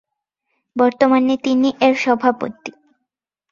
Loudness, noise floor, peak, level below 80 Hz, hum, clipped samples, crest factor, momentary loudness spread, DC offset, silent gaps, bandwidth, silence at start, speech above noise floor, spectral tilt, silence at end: -16 LUFS; -79 dBFS; -2 dBFS; -62 dBFS; none; under 0.1%; 16 dB; 15 LU; under 0.1%; none; 7.4 kHz; 0.75 s; 63 dB; -5 dB/octave; 0.8 s